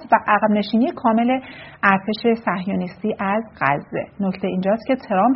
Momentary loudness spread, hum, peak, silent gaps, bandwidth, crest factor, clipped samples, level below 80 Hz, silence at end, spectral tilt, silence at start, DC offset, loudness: 8 LU; none; -2 dBFS; none; 5.8 kHz; 18 dB; under 0.1%; -56 dBFS; 0 s; -5 dB/octave; 0 s; under 0.1%; -20 LUFS